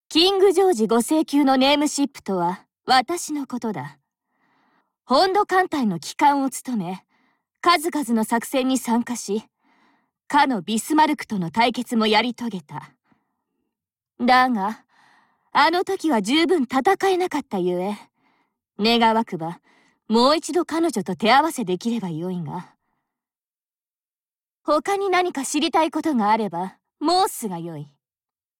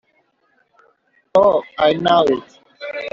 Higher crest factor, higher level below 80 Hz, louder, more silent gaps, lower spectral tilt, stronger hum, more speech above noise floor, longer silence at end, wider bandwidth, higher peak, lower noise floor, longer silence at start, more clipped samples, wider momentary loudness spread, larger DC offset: about the same, 18 dB vs 16 dB; about the same, -62 dBFS vs -58 dBFS; second, -21 LUFS vs -16 LUFS; neither; about the same, -4 dB/octave vs -3 dB/octave; neither; first, over 69 dB vs 48 dB; first, 0.75 s vs 0.05 s; first, 17 kHz vs 7.4 kHz; about the same, -4 dBFS vs -2 dBFS; first, under -90 dBFS vs -63 dBFS; second, 0.1 s vs 1.35 s; neither; about the same, 13 LU vs 14 LU; neither